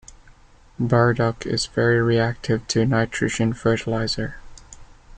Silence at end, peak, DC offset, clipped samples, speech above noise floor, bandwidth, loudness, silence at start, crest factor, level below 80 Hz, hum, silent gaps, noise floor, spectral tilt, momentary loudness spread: 0 s; -6 dBFS; under 0.1%; under 0.1%; 29 dB; 9.2 kHz; -21 LUFS; 0.1 s; 16 dB; -44 dBFS; none; none; -50 dBFS; -5.5 dB/octave; 7 LU